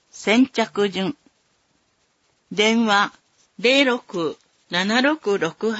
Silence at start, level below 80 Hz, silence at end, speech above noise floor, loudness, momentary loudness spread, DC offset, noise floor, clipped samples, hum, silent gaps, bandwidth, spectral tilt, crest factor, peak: 0.15 s; -70 dBFS; 0 s; 46 dB; -20 LUFS; 11 LU; under 0.1%; -66 dBFS; under 0.1%; none; none; 8 kHz; -4 dB/octave; 18 dB; -4 dBFS